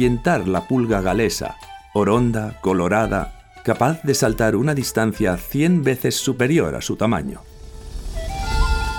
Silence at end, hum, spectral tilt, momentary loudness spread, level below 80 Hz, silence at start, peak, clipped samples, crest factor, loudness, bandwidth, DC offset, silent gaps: 0 s; none; -5.5 dB/octave; 13 LU; -30 dBFS; 0 s; -2 dBFS; under 0.1%; 16 dB; -20 LUFS; 19 kHz; under 0.1%; none